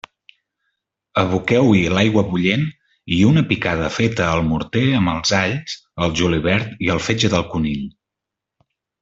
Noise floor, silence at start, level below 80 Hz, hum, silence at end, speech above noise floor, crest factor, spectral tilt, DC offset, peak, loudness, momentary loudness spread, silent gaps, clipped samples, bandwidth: -84 dBFS; 1.15 s; -44 dBFS; none; 1.1 s; 66 dB; 16 dB; -5.5 dB/octave; under 0.1%; -2 dBFS; -18 LUFS; 8 LU; none; under 0.1%; 8 kHz